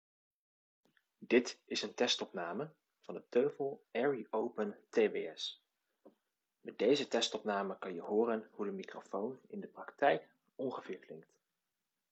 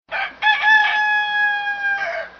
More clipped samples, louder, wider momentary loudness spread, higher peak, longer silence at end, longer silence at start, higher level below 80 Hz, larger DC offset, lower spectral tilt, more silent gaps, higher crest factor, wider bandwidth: neither; second, -37 LUFS vs -17 LUFS; first, 16 LU vs 8 LU; second, -16 dBFS vs -4 dBFS; first, 0.9 s vs 0.1 s; first, 1.2 s vs 0.1 s; second, under -90 dBFS vs -62 dBFS; neither; first, -3.5 dB/octave vs 4.5 dB/octave; neither; first, 22 dB vs 14 dB; first, 8.4 kHz vs 6.4 kHz